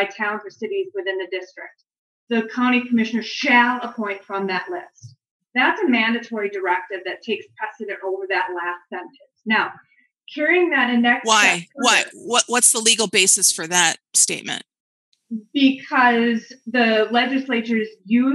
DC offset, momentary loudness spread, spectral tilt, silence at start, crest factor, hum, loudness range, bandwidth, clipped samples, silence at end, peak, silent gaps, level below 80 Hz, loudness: under 0.1%; 15 LU; -1.5 dB/octave; 0 s; 20 dB; none; 9 LU; 13 kHz; under 0.1%; 0 s; 0 dBFS; 1.98-2.27 s, 5.31-5.40 s, 14.80-15.12 s; -90 dBFS; -19 LUFS